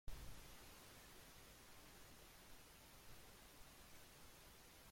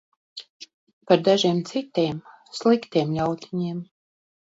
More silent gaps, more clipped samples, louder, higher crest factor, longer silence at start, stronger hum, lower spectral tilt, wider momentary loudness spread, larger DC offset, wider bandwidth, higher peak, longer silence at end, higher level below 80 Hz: second, none vs 0.50-0.60 s, 0.74-0.87 s, 0.93-1.01 s; neither; second, -62 LUFS vs -23 LUFS; about the same, 20 dB vs 22 dB; second, 0.05 s vs 0.35 s; neither; second, -3 dB/octave vs -6 dB/octave; second, 3 LU vs 21 LU; neither; first, 16.5 kHz vs 8 kHz; second, -38 dBFS vs -4 dBFS; second, 0 s vs 0.7 s; about the same, -66 dBFS vs -62 dBFS